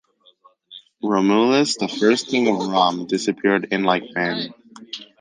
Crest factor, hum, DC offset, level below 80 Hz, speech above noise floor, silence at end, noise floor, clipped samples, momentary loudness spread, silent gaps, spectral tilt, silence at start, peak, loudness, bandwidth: 18 dB; none; under 0.1%; -68 dBFS; 36 dB; 0.15 s; -55 dBFS; under 0.1%; 12 LU; none; -4.5 dB/octave; 0.7 s; -2 dBFS; -19 LUFS; 9.8 kHz